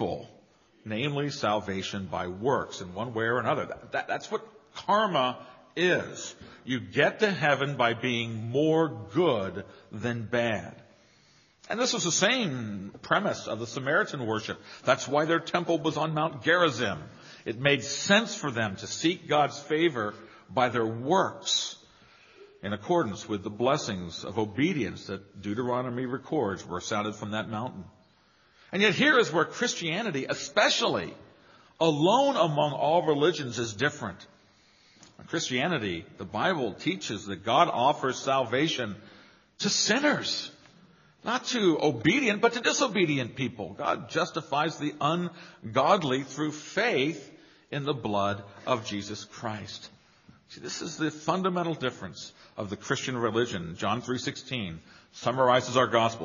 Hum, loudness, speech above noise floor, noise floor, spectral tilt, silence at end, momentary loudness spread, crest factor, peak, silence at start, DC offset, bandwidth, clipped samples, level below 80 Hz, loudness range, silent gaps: none; -28 LUFS; 35 dB; -63 dBFS; -3 dB/octave; 0 s; 14 LU; 22 dB; -6 dBFS; 0 s; under 0.1%; 7.4 kHz; under 0.1%; -66 dBFS; 5 LU; none